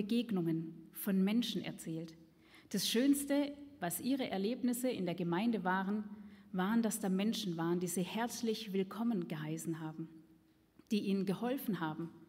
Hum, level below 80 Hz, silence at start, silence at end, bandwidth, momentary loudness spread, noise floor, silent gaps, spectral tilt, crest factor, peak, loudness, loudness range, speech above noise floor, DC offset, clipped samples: none; -78 dBFS; 0 s; 0.05 s; 16 kHz; 10 LU; -67 dBFS; none; -5 dB/octave; 16 dB; -22 dBFS; -37 LUFS; 4 LU; 31 dB; under 0.1%; under 0.1%